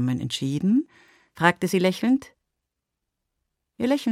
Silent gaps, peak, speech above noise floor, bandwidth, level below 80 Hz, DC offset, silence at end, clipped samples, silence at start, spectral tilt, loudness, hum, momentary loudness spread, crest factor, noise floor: none; -2 dBFS; 60 dB; 15.5 kHz; -64 dBFS; under 0.1%; 0 s; under 0.1%; 0 s; -6 dB/octave; -24 LUFS; none; 5 LU; 24 dB; -83 dBFS